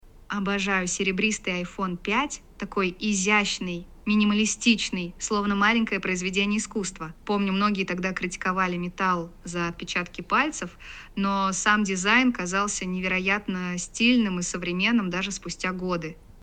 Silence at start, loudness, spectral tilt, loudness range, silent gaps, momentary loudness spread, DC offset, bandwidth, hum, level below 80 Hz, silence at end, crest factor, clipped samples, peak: 0.05 s; -25 LUFS; -3.5 dB/octave; 3 LU; none; 9 LU; under 0.1%; 9.4 kHz; none; -48 dBFS; 0.05 s; 20 dB; under 0.1%; -6 dBFS